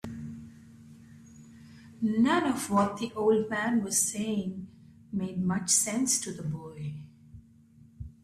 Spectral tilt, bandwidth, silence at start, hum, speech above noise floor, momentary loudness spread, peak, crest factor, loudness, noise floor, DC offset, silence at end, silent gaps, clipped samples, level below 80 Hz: -4 dB/octave; 15 kHz; 0.05 s; none; 28 dB; 19 LU; -12 dBFS; 20 dB; -28 LUFS; -57 dBFS; under 0.1%; 0.1 s; none; under 0.1%; -60 dBFS